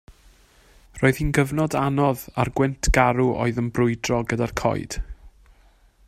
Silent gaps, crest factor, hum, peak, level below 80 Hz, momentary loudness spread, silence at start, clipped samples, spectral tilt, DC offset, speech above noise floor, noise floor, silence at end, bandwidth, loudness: none; 20 dB; none; -4 dBFS; -34 dBFS; 6 LU; 0.95 s; under 0.1%; -6 dB/octave; under 0.1%; 34 dB; -56 dBFS; 0.8 s; 15.5 kHz; -22 LUFS